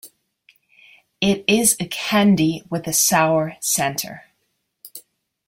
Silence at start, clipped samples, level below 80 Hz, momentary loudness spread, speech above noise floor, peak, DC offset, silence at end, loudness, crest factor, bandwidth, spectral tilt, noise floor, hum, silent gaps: 0.05 s; under 0.1%; -56 dBFS; 15 LU; 53 dB; -2 dBFS; under 0.1%; 0.5 s; -18 LUFS; 20 dB; 16.5 kHz; -3.5 dB/octave; -72 dBFS; none; none